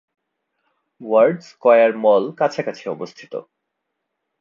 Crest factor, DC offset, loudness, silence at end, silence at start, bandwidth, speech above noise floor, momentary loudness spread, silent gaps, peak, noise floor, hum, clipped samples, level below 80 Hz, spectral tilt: 18 dB; under 0.1%; -17 LUFS; 1 s; 1 s; 7.2 kHz; 60 dB; 19 LU; none; -2 dBFS; -77 dBFS; none; under 0.1%; -76 dBFS; -6.5 dB/octave